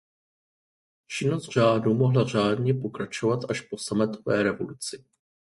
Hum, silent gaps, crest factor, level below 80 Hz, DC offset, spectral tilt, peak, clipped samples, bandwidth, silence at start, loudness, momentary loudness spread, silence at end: none; none; 18 dB; -62 dBFS; under 0.1%; -6 dB/octave; -8 dBFS; under 0.1%; 11.5 kHz; 1.1 s; -26 LUFS; 11 LU; 0.5 s